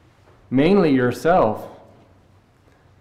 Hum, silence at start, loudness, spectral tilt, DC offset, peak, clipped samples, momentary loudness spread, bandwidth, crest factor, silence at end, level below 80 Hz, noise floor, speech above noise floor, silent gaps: none; 0.5 s; -18 LUFS; -7.5 dB/octave; under 0.1%; -6 dBFS; under 0.1%; 13 LU; 14.5 kHz; 14 dB; 1.25 s; -46 dBFS; -54 dBFS; 38 dB; none